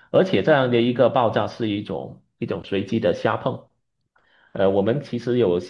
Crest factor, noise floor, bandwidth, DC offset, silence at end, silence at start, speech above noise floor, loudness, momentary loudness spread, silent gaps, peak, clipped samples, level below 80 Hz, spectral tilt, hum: 18 dB; -68 dBFS; 7.2 kHz; under 0.1%; 0 s; 0.15 s; 48 dB; -21 LUFS; 14 LU; none; -4 dBFS; under 0.1%; -62 dBFS; -7.5 dB/octave; none